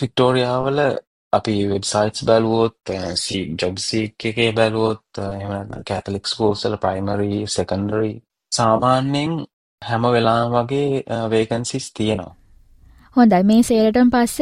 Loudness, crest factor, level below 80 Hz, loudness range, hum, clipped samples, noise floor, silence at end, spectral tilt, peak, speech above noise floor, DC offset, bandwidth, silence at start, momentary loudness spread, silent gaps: -19 LUFS; 18 dB; -50 dBFS; 3 LU; none; under 0.1%; -49 dBFS; 0 s; -5.5 dB/octave; -2 dBFS; 30 dB; under 0.1%; 14 kHz; 0 s; 12 LU; 1.07-1.31 s, 9.53-9.78 s